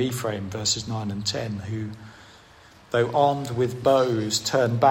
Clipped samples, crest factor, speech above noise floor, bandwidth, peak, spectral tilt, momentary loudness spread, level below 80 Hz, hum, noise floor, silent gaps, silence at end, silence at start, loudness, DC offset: under 0.1%; 18 dB; 27 dB; 16 kHz; -6 dBFS; -4.5 dB/octave; 10 LU; -58 dBFS; none; -51 dBFS; none; 0 s; 0 s; -24 LUFS; under 0.1%